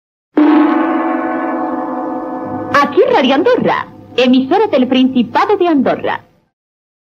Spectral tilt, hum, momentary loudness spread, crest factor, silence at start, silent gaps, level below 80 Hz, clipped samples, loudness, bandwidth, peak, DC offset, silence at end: -6 dB/octave; none; 10 LU; 12 dB; 0.35 s; none; -56 dBFS; under 0.1%; -13 LUFS; 7 kHz; 0 dBFS; under 0.1%; 0.8 s